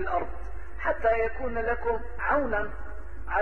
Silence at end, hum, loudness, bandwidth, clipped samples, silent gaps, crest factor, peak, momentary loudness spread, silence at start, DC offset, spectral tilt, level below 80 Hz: 0 s; none; -29 LUFS; 6.4 kHz; under 0.1%; none; 16 dB; -12 dBFS; 16 LU; 0 s; 2%; -8 dB/octave; -40 dBFS